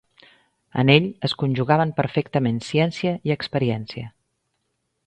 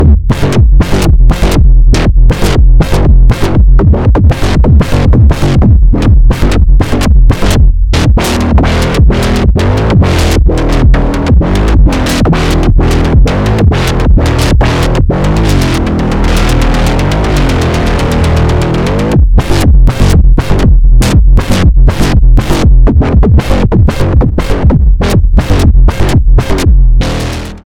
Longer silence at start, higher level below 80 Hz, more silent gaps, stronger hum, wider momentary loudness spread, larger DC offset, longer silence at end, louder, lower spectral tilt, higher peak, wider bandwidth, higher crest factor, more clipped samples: first, 0.75 s vs 0 s; second, -56 dBFS vs -8 dBFS; neither; neither; first, 13 LU vs 3 LU; neither; first, 1 s vs 0.15 s; second, -22 LUFS vs -8 LUFS; about the same, -7 dB/octave vs -6.5 dB/octave; about the same, -2 dBFS vs 0 dBFS; second, 9 kHz vs 13.5 kHz; first, 22 dB vs 6 dB; second, under 0.1% vs 6%